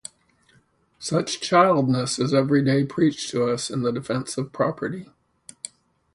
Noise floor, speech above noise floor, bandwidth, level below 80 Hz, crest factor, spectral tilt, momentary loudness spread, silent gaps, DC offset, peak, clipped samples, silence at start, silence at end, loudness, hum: -61 dBFS; 39 dB; 11.5 kHz; -62 dBFS; 20 dB; -5.5 dB/octave; 19 LU; none; under 0.1%; -4 dBFS; under 0.1%; 1 s; 1.1 s; -22 LUFS; none